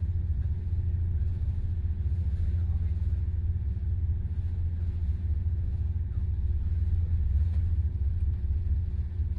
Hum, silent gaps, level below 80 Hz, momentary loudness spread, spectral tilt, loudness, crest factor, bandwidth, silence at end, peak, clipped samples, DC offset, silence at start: none; none; -32 dBFS; 3 LU; -10.5 dB/octave; -31 LUFS; 10 dB; 2.4 kHz; 0 s; -18 dBFS; under 0.1%; under 0.1%; 0 s